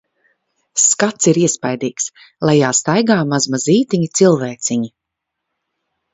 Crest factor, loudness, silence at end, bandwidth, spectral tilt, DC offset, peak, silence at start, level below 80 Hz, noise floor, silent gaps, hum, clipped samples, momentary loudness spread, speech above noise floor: 16 dB; -15 LUFS; 1.25 s; 8.2 kHz; -4 dB/octave; under 0.1%; 0 dBFS; 0.75 s; -60 dBFS; -79 dBFS; none; none; under 0.1%; 9 LU; 64 dB